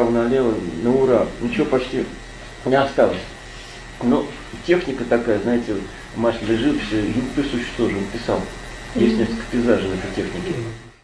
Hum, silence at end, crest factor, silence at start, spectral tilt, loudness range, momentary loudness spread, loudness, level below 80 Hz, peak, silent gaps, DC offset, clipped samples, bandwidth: none; 0.15 s; 20 dB; 0 s; -6 dB/octave; 2 LU; 13 LU; -21 LUFS; -40 dBFS; -2 dBFS; none; under 0.1%; under 0.1%; 11 kHz